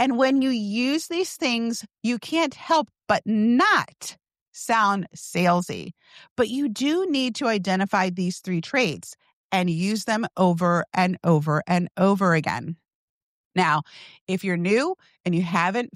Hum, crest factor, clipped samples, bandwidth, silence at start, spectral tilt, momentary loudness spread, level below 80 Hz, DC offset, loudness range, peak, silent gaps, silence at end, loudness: none; 16 dB; under 0.1%; 14.5 kHz; 0 s; -5.5 dB/octave; 11 LU; -66 dBFS; under 0.1%; 2 LU; -8 dBFS; 4.41-4.52 s, 6.31-6.36 s, 9.33-9.50 s, 12.95-13.51 s, 14.21-14.27 s, 15.20-15.24 s; 0.1 s; -23 LUFS